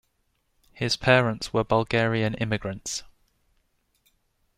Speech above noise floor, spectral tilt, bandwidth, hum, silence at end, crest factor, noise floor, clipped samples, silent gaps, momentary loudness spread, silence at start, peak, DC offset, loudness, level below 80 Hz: 47 dB; -5 dB/octave; 14.5 kHz; none; 1.55 s; 24 dB; -72 dBFS; under 0.1%; none; 12 LU; 0.75 s; -4 dBFS; under 0.1%; -25 LUFS; -52 dBFS